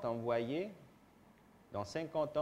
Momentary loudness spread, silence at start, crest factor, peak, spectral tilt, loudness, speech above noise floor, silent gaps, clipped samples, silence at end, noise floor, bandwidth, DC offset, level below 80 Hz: 10 LU; 0 s; 18 dB; -22 dBFS; -6.5 dB/octave; -40 LUFS; 26 dB; none; under 0.1%; 0 s; -64 dBFS; 15 kHz; under 0.1%; -72 dBFS